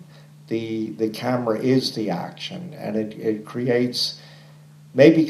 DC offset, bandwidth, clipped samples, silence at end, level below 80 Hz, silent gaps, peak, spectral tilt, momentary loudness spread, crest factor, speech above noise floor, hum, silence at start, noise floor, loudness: under 0.1%; 14 kHz; under 0.1%; 0 s; -70 dBFS; none; 0 dBFS; -6 dB/octave; 11 LU; 22 dB; 25 dB; none; 0 s; -47 dBFS; -23 LUFS